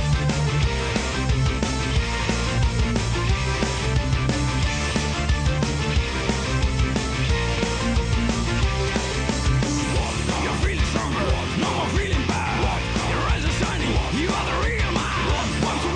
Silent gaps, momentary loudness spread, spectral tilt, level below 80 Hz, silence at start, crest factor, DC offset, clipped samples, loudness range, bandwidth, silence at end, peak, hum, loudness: none; 1 LU; -5 dB/octave; -26 dBFS; 0 s; 12 dB; under 0.1%; under 0.1%; 0 LU; 10.5 kHz; 0 s; -10 dBFS; none; -23 LUFS